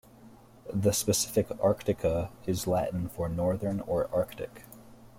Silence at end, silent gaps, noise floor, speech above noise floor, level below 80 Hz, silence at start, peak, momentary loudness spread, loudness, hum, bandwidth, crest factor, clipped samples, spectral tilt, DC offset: 0 s; none; -54 dBFS; 24 dB; -52 dBFS; 0.2 s; -12 dBFS; 10 LU; -30 LUFS; none; 16.5 kHz; 18 dB; under 0.1%; -5 dB/octave; under 0.1%